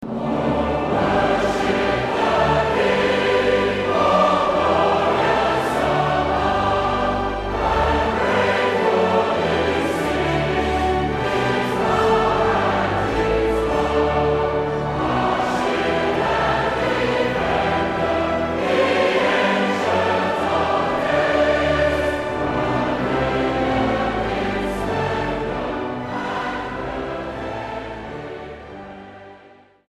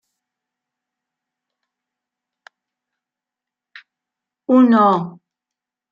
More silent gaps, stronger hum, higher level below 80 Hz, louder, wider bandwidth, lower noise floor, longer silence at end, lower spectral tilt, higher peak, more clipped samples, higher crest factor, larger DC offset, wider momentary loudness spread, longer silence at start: neither; neither; first, -36 dBFS vs -76 dBFS; second, -20 LUFS vs -14 LUFS; first, 14.5 kHz vs 5.2 kHz; second, -49 dBFS vs -87 dBFS; second, 0.4 s vs 0.8 s; second, -6 dB/octave vs -8.5 dB/octave; about the same, -4 dBFS vs -2 dBFS; neither; about the same, 16 dB vs 20 dB; neither; second, 8 LU vs 21 LU; second, 0 s vs 4.5 s